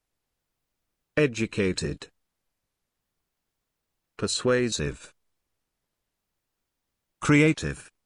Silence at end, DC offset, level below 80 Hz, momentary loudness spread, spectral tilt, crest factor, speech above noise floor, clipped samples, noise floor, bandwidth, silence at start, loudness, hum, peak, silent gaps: 0.25 s; under 0.1%; -52 dBFS; 14 LU; -5 dB/octave; 22 dB; 57 dB; under 0.1%; -82 dBFS; 11 kHz; 1.15 s; -26 LUFS; none; -8 dBFS; none